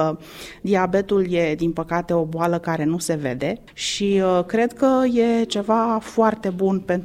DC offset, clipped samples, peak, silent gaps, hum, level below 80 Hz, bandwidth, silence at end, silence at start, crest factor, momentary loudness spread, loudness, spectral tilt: under 0.1%; under 0.1%; -4 dBFS; none; none; -50 dBFS; 16 kHz; 0 s; 0 s; 16 dB; 7 LU; -21 LUFS; -5.5 dB/octave